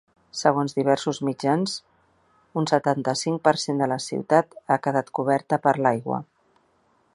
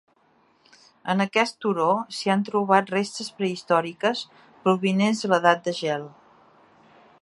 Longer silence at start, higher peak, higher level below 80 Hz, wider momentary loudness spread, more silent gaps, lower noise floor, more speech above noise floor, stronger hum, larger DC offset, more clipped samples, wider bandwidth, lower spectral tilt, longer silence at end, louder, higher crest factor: second, 0.35 s vs 1.05 s; about the same, -2 dBFS vs -2 dBFS; about the same, -70 dBFS vs -74 dBFS; second, 7 LU vs 10 LU; neither; about the same, -64 dBFS vs -62 dBFS; about the same, 42 dB vs 39 dB; neither; neither; neither; about the same, 11.5 kHz vs 11.5 kHz; about the same, -5 dB/octave vs -5 dB/octave; second, 0.9 s vs 1.15 s; about the same, -24 LUFS vs -24 LUFS; about the same, 22 dB vs 22 dB